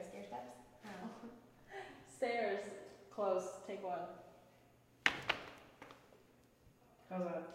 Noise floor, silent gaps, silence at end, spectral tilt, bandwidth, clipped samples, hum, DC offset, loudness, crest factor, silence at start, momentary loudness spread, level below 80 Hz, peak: -68 dBFS; none; 0 s; -4 dB/octave; 16 kHz; under 0.1%; none; under 0.1%; -42 LUFS; 34 dB; 0 s; 21 LU; -76 dBFS; -12 dBFS